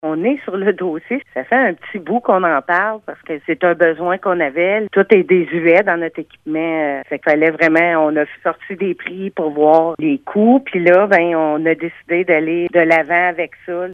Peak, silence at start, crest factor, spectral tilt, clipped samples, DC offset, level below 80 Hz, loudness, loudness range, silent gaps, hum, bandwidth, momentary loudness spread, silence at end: 0 dBFS; 0.05 s; 16 dB; -8 dB/octave; under 0.1%; under 0.1%; -64 dBFS; -15 LUFS; 3 LU; none; none; 6.6 kHz; 10 LU; 0 s